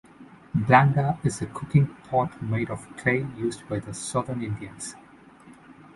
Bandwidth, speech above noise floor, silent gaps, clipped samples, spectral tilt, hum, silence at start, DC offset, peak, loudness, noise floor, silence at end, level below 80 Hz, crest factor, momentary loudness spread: 11.5 kHz; 25 dB; none; under 0.1%; -6.5 dB/octave; none; 0.2 s; under 0.1%; -4 dBFS; -25 LUFS; -50 dBFS; 0.25 s; -54 dBFS; 22 dB; 15 LU